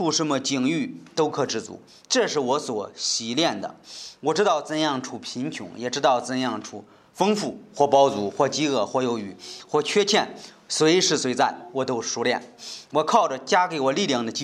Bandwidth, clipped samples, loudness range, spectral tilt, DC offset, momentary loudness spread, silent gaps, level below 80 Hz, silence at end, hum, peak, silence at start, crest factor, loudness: 13.5 kHz; under 0.1%; 3 LU; -3.5 dB/octave; under 0.1%; 13 LU; none; -74 dBFS; 0 s; none; -4 dBFS; 0 s; 18 dB; -23 LUFS